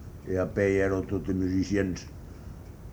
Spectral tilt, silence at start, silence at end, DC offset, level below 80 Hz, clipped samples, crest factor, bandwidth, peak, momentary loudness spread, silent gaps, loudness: -7 dB/octave; 0 s; 0 s; under 0.1%; -46 dBFS; under 0.1%; 18 dB; over 20 kHz; -12 dBFS; 19 LU; none; -28 LUFS